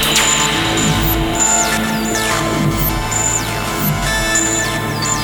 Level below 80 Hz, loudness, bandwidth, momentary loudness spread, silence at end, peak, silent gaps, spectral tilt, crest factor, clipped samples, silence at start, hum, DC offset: -28 dBFS; -14 LUFS; over 20 kHz; 5 LU; 0 s; -2 dBFS; none; -2.5 dB/octave; 14 dB; under 0.1%; 0 s; none; under 0.1%